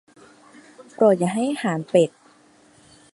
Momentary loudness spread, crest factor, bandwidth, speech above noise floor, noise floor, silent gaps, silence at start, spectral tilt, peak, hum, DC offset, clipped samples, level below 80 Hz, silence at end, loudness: 7 LU; 20 dB; 11.5 kHz; 35 dB; -54 dBFS; none; 0.8 s; -6 dB/octave; -4 dBFS; none; under 0.1%; under 0.1%; -70 dBFS; 1.05 s; -21 LUFS